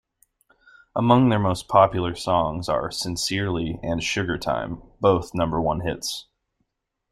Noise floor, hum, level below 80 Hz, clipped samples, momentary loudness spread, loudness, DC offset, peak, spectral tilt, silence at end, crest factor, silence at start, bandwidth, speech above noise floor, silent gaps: -77 dBFS; none; -46 dBFS; under 0.1%; 10 LU; -23 LUFS; under 0.1%; -2 dBFS; -5.5 dB/octave; 0.9 s; 22 dB; 0.95 s; 15 kHz; 55 dB; none